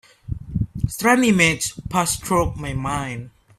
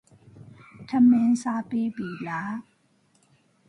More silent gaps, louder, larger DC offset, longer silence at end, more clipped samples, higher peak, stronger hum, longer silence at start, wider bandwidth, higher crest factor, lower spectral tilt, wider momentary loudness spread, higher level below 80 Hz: neither; first, -20 LUFS vs -24 LUFS; neither; second, 0.3 s vs 1.1 s; neither; first, -2 dBFS vs -10 dBFS; neither; about the same, 0.3 s vs 0.35 s; first, 16 kHz vs 10.5 kHz; about the same, 20 dB vs 16 dB; second, -4.5 dB/octave vs -6.5 dB/octave; about the same, 15 LU vs 16 LU; first, -38 dBFS vs -70 dBFS